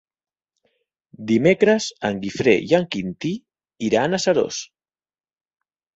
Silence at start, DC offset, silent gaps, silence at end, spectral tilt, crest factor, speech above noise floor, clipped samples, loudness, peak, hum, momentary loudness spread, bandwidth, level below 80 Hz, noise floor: 1.2 s; under 0.1%; none; 1.3 s; -5 dB/octave; 20 dB; over 70 dB; under 0.1%; -20 LUFS; -2 dBFS; none; 13 LU; 8.2 kHz; -58 dBFS; under -90 dBFS